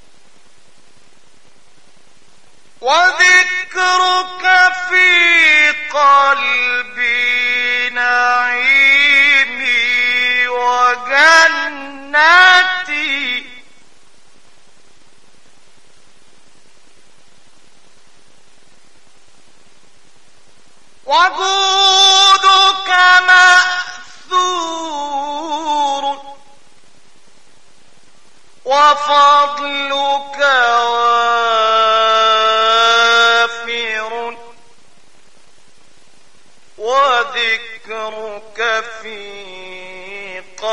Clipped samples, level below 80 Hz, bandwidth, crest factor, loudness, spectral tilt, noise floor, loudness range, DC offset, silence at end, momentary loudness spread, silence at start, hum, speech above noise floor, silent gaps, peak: under 0.1%; -60 dBFS; 11 kHz; 16 dB; -11 LUFS; 1 dB/octave; -52 dBFS; 12 LU; 1%; 0 s; 18 LU; 2.8 s; none; 40 dB; none; 0 dBFS